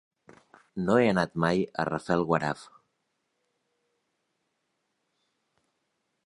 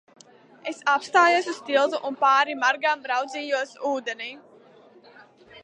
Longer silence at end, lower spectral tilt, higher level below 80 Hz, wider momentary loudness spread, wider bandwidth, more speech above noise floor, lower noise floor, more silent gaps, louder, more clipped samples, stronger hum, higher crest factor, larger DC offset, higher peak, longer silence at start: first, 3.6 s vs 0.05 s; first, -7 dB/octave vs -1.5 dB/octave; first, -62 dBFS vs -82 dBFS; second, 10 LU vs 14 LU; about the same, 11 kHz vs 10.5 kHz; first, 52 dB vs 29 dB; first, -79 dBFS vs -52 dBFS; neither; second, -27 LUFS vs -23 LUFS; neither; neither; about the same, 24 dB vs 20 dB; neither; about the same, -8 dBFS vs -6 dBFS; about the same, 0.75 s vs 0.65 s